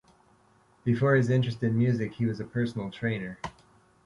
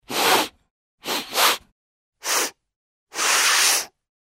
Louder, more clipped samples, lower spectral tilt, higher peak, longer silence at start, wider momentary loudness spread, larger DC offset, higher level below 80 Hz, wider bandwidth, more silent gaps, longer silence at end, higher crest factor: second, -28 LUFS vs -19 LUFS; neither; first, -8 dB/octave vs 1 dB/octave; second, -12 dBFS vs -4 dBFS; first, 0.85 s vs 0.1 s; second, 11 LU vs 16 LU; neither; first, -60 dBFS vs -68 dBFS; second, 10.5 kHz vs 16.5 kHz; second, none vs 0.70-0.98 s, 1.72-2.12 s, 2.76-3.07 s; about the same, 0.55 s vs 0.45 s; about the same, 18 dB vs 20 dB